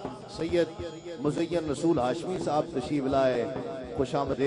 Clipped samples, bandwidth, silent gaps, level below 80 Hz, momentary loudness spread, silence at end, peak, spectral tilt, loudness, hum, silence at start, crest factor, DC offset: under 0.1%; 10.5 kHz; none; -54 dBFS; 10 LU; 0 s; -12 dBFS; -6.5 dB/octave; -29 LUFS; none; 0 s; 16 dB; under 0.1%